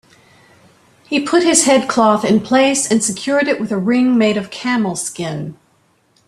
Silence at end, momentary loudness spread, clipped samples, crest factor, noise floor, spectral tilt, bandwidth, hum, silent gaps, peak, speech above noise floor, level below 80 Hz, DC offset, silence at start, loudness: 0.75 s; 10 LU; under 0.1%; 16 dB; -58 dBFS; -3.5 dB/octave; 14 kHz; none; none; 0 dBFS; 43 dB; -58 dBFS; under 0.1%; 1.1 s; -15 LUFS